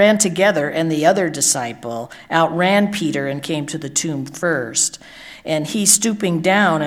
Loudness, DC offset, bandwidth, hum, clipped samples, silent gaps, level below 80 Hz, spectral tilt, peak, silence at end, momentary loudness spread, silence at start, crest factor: -17 LUFS; under 0.1%; 17.5 kHz; none; under 0.1%; none; -60 dBFS; -3.5 dB/octave; 0 dBFS; 0 s; 12 LU; 0 s; 18 dB